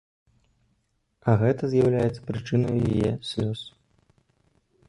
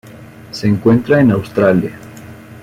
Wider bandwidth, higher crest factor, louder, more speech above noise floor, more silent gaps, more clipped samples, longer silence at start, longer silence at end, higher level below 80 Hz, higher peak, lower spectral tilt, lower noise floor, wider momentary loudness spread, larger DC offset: second, 11 kHz vs 15.5 kHz; about the same, 18 dB vs 14 dB; second, -25 LUFS vs -13 LUFS; first, 48 dB vs 24 dB; neither; neither; first, 1.25 s vs 0.05 s; first, 1.2 s vs 0 s; about the same, -50 dBFS vs -48 dBFS; second, -8 dBFS vs -2 dBFS; about the same, -8 dB/octave vs -8 dB/octave; first, -72 dBFS vs -36 dBFS; second, 10 LU vs 22 LU; neither